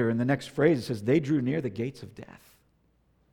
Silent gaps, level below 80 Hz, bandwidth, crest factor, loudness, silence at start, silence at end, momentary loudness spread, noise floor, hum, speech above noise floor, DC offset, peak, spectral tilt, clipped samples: none; -64 dBFS; 16.5 kHz; 20 dB; -27 LUFS; 0 s; 1.1 s; 19 LU; -67 dBFS; none; 40 dB; under 0.1%; -8 dBFS; -7.5 dB/octave; under 0.1%